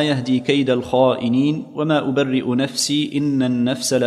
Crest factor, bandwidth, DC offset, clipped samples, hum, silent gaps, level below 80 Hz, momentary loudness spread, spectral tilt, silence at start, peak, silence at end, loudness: 16 dB; 14 kHz; under 0.1%; under 0.1%; none; none; -58 dBFS; 3 LU; -5 dB/octave; 0 s; -2 dBFS; 0 s; -19 LUFS